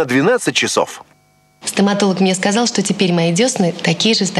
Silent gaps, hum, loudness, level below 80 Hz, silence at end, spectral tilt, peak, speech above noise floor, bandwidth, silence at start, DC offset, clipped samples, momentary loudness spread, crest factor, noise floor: none; none; -15 LUFS; -62 dBFS; 0 s; -4 dB/octave; 0 dBFS; 39 dB; 13 kHz; 0 s; under 0.1%; under 0.1%; 6 LU; 16 dB; -54 dBFS